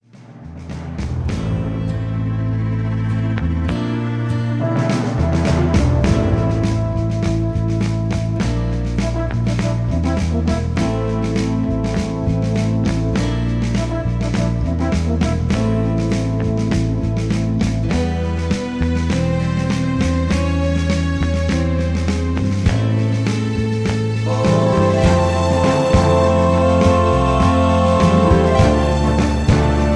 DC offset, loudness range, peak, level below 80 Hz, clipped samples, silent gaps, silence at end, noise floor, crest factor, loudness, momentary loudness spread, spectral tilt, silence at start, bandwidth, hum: under 0.1%; 5 LU; -2 dBFS; -26 dBFS; under 0.1%; none; 0 s; -37 dBFS; 14 dB; -18 LUFS; 7 LU; -7 dB/octave; 0.2 s; 11 kHz; none